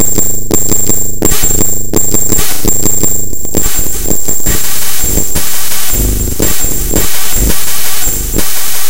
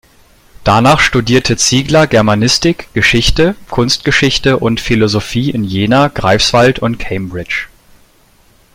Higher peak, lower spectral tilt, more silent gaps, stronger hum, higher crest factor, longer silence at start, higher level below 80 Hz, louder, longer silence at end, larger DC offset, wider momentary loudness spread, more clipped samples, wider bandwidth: about the same, 0 dBFS vs 0 dBFS; second, -2.5 dB/octave vs -4.5 dB/octave; neither; neither; second, 4 dB vs 12 dB; second, 0 s vs 0.6 s; first, -20 dBFS vs -30 dBFS; about the same, -11 LUFS vs -11 LUFS; second, 0 s vs 1.1 s; neither; second, 4 LU vs 9 LU; first, 0.8% vs under 0.1%; first, over 20 kHz vs 16.5 kHz